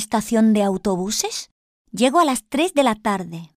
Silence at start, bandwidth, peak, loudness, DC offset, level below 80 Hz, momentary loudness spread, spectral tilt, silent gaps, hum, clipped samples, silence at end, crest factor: 0 s; 15.5 kHz; -4 dBFS; -19 LUFS; under 0.1%; -54 dBFS; 9 LU; -4 dB/octave; 1.51-1.85 s; none; under 0.1%; 0.1 s; 16 dB